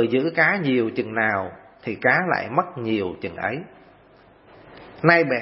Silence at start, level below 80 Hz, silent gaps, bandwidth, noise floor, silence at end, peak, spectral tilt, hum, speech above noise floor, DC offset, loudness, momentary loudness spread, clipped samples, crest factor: 0 s; -62 dBFS; none; 5.8 kHz; -52 dBFS; 0 s; 0 dBFS; -10 dB/octave; none; 31 dB; under 0.1%; -22 LUFS; 12 LU; under 0.1%; 22 dB